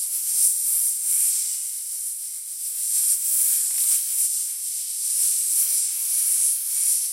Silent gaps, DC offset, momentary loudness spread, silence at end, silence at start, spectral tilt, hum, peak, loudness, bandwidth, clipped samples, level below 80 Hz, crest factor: none; under 0.1%; 9 LU; 0 s; 0 s; 7.5 dB/octave; none; -6 dBFS; -20 LUFS; 16 kHz; under 0.1%; -78 dBFS; 18 dB